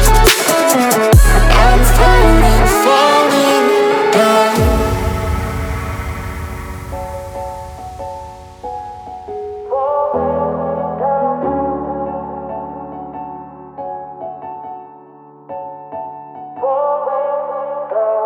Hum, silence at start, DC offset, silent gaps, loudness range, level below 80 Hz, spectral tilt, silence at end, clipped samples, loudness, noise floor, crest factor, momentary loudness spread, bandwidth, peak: none; 0 s; under 0.1%; none; 17 LU; -20 dBFS; -4.5 dB/octave; 0 s; under 0.1%; -14 LUFS; -40 dBFS; 14 dB; 19 LU; over 20 kHz; 0 dBFS